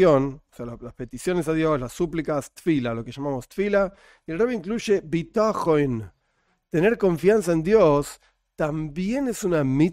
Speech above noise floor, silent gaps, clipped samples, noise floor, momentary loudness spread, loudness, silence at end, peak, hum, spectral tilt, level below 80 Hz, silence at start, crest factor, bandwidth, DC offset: 47 dB; none; under 0.1%; -70 dBFS; 15 LU; -23 LUFS; 0 s; -6 dBFS; none; -6.5 dB/octave; -48 dBFS; 0 s; 18 dB; 16 kHz; under 0.1%